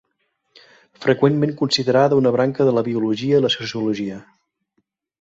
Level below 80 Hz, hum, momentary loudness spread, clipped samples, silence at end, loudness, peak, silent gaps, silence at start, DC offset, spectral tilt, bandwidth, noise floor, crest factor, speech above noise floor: -60 dBFS; none; 8 LU; under 0.1%; 1 s; -19 LUFS; -2 dBFS; none; 1 s; under 0.1%; -6 dB/octave; 8 kHz; -71 dBFS; 18 dB; 53 dB